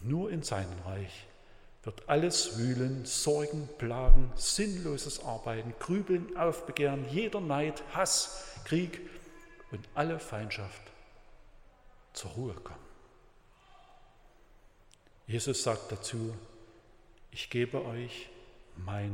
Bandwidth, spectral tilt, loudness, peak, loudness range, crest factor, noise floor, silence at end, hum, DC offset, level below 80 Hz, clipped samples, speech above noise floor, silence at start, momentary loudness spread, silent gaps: 15.5 kHz; -4 dB/octave; -33 LUFS; -6 dBFS; 15 LU; 26 dB; -61 dBFS; 0 s; none; under 0.1%; -36 dBFS; under 0.1%; 31 dB; 0 s; 17 LU; none